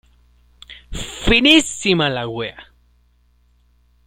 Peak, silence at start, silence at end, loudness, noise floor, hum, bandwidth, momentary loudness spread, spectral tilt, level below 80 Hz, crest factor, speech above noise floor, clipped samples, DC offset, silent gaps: 0 dBFS; 0.7 s; 1.45 s; -15 LUFS; -57 dBFS; 60 Hz at -45 dBFS; 16 kHz; 19 LU; -3.5 dB/octave; -36 dBFS; 20 dB; 41 dB; under 0.1%; under 0.1%; none